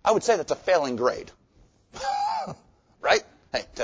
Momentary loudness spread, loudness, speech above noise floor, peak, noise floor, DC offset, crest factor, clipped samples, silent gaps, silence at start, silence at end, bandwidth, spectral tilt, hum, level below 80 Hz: 15 LU; -26 LUFS; 36 dB; -6 dBFS; -59 dBFS; under 0.1%; 20 dB; under 0.1%; none; 0.05 s; 0 s; 8 kHz; -3 dB/octave; none; -58 dBFS